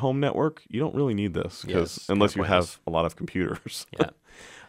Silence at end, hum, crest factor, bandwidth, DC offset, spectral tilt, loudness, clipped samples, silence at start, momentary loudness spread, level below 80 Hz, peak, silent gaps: 0.05 s; none; 20 dB; 16 kHz; under 0.1%; -6 dB/octave; -27 LUFS; under 0.1%; 0 s; 7 LU; -52 dBFS; -6 dBFS; none